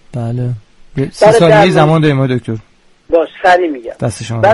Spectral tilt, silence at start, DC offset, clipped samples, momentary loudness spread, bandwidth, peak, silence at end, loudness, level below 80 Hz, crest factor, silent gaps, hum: -6.5 dB/octave; 0.15 s; under 0.1%; 0.1%; 15 LU; 11.5 kHz; 0 dBFS; 0 s; -11 LUFS; -42 dBFS; 12 dB; none; none